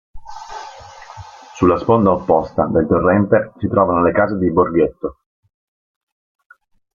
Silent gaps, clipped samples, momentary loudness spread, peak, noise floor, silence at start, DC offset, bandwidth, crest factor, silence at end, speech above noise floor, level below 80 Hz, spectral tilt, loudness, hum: none; under 0.1%; 22 LU; 0 dBFS; -37 dBFS; 0.15 s; under 0.1%; 7.2 kHz; 16 dB; 1.85 s; 22 dB; -44 dBFS; -8.5 dB/octave; -16 LUFS; none